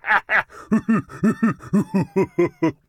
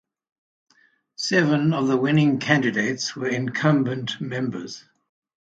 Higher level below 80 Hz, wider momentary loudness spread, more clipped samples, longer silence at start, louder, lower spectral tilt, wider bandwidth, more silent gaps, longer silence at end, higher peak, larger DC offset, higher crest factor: first, -54 dBFS vs -66 dBFS; second, 5 LU vs 10 LU; neither; second, 0.05 s vs 1.2 s; about the same, -21 LUFS vs -22 LUFS; first, -7.5 dB/octave vs -5.5 dB/octave; first, 12 kHz vs 9 kHz; neither; second, 0.15 s vs 0.75 s; about the same, -4 dBFS vs -2 dBFS; neither; second, 16 dB vs 22 dB